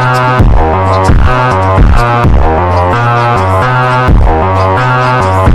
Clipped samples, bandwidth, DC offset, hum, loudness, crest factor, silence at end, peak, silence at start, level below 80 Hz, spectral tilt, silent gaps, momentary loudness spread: 2%; 12 kHz; under 0.1%; none; -8 LUFS; 6 dB; 0 s; 0 dBFS; 0 s; -12 dBFS; -7 dB/octave; none; 1 LU